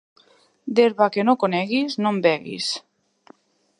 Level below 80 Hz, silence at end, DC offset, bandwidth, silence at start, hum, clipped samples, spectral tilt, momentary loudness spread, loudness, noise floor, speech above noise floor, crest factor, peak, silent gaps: -74 dBFS; 1 s; under 0.1%; 11 kHz; 0.65 s; none; under 0.1%; -5 dB/octave; 8 LU; -21 LUFS; -58 dBFS; 37 dB; 20 dB; -4 dBFS; none